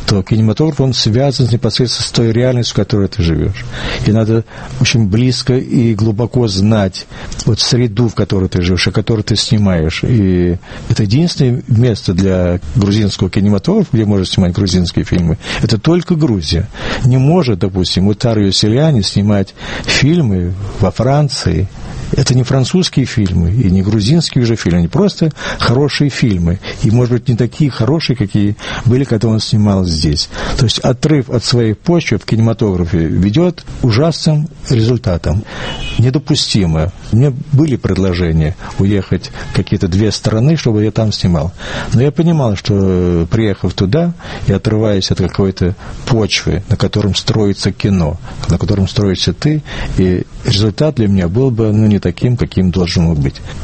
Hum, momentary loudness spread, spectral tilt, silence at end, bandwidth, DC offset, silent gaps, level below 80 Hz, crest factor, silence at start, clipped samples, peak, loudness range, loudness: none; 5 LU; -6 dB/octave; 0 s; 8.8 kHz; under 0.1%; none; -30 dBFS; 12 dB; 0 s; under 0.1%; 0 dBFS; 2 LU; -13 LUFS